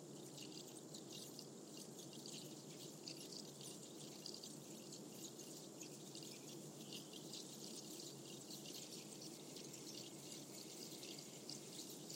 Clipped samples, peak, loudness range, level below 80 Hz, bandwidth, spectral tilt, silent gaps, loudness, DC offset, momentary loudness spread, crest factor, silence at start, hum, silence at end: under 0.1%; -34 dBFS; 1 LU; under -90 dBFS; 16.5 kHz; -3 dB/octave; none; -53 LUFS; under 0.1%; 3 LU; 20 dB; 0 s; none; 0 s